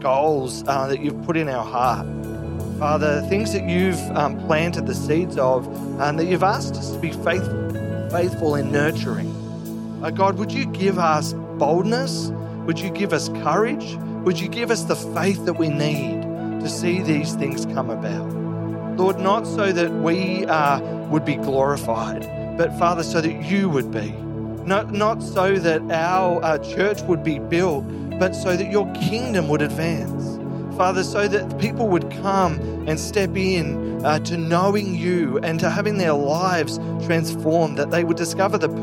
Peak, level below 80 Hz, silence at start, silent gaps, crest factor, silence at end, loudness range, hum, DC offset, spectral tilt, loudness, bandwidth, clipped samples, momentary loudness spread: -4 dBFS; -50 dBFS; 0 s; none; 18 dB; 0 s; 2 LU; none; under 0.1%; -6 dB/octave; -22 LUFS; 16.5 kHz; under 0.1%; 7 LU